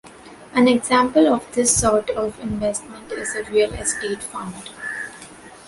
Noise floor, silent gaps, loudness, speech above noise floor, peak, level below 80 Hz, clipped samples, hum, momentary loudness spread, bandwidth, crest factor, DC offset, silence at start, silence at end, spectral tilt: -42 dBFS; none; -20 LUFS; 23 dB; -4 dBFS; -46 dBFS; under 0.1%; none; 16 LU; 12 kHz; 18 dB; under 0.1%; 0.05 s; 0.1 s; -3.5 dB/octave